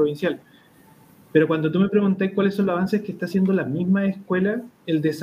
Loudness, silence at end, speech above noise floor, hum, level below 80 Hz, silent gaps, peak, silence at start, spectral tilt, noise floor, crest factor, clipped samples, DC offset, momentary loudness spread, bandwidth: -22 LUFS; 0 s; 31 dB; none; -62 dBFS; none; -4 dBFS; 0 s; -8 dB/octave; -52 dBFS; 18 dB; under 0.1%; under 0.1%; 6 LU; 12.5 kHz